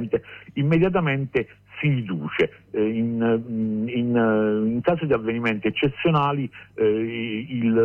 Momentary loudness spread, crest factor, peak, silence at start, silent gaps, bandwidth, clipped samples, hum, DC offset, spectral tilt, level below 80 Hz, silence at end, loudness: 7 LU; 14 dB; -10 dBFS; 0 s; none; 5.2 kHz; under 0.1%; none; under 0.1%; -9 dB/octave; -54 dBFS; 0 s; -23 LUFS